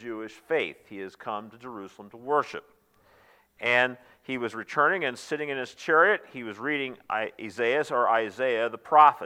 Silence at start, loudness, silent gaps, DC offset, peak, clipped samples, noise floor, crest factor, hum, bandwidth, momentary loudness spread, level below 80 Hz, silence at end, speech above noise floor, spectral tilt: 0 s; -26 LUFS; none; under 0.1%; -4 dBFS; under 0.1%; -61 dBFS; 24 dB; none; 15.5 kHz; 19 LU; -76 dBFS; 0 s; 34 dB; -4.5 dB/octave